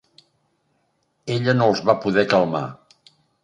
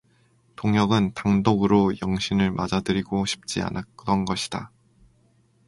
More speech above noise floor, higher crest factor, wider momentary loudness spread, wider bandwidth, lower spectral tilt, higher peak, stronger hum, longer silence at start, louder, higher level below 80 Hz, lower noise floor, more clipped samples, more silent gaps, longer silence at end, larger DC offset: first, 50 dB vs 39 dB; about the same, 20 dB vs 20 dB; about the same, 12 LU vs 10 LU; second, 9.8 kHz vs 11.5 kHz; about the same, -6.5 dB/octave vs -6 dB/octave; about the same, -2 dBFS vs -4 dBFS; neither; first, 1.25 s vs 0.6 s; first, -20 LUFS vs -24 LUFS; second, -60 dBFS vs -48 dBFS; first, -69 dBFS vs -62 dBFS; neither; neither; second, 0.7 s vs 1 s; neither